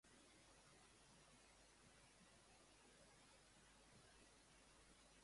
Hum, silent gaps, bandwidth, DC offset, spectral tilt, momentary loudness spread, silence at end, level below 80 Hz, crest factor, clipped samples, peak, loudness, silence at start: none; none; 11.5 kHz; under 0.1%; -2.5 dB/octave; 1 LU; 0 s; -80 dBFS; 14 dB; under 0.1%; -56 dBFS; -69 LUFS; 0.05 s